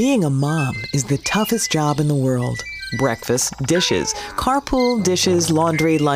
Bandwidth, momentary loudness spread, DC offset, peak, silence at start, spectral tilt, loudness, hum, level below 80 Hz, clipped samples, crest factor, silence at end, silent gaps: 16 kHz; 6 LU; under 0.1%; -6 dBFS; 0 s; -4.5 dB/octave; -19 LUFS; none; -42 dBFS; under 0.1%; 12 dB; 0 s; none